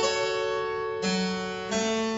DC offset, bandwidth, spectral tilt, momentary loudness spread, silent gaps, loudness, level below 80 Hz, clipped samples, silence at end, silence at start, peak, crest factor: under 0.1%; 8 kHz; -3.5 dB/octave; 4 LU; none; -28 LUFS; -60 dBFS; under 0.1%; 0 s; 0 s; -12 dBFS; 16 dB